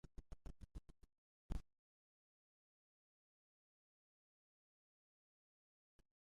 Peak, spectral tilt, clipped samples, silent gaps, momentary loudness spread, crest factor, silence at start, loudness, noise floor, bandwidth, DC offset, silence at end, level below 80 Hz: -32 dBFS; -7 dB/octave; under 0.1%; 1.18-1.49 s; 8 LU; 26 dB; 0.05 s; -58 LUFS; under -90 dBFS; 10.5 kHz; under 0.1%; 4.75 s; -62 dBFS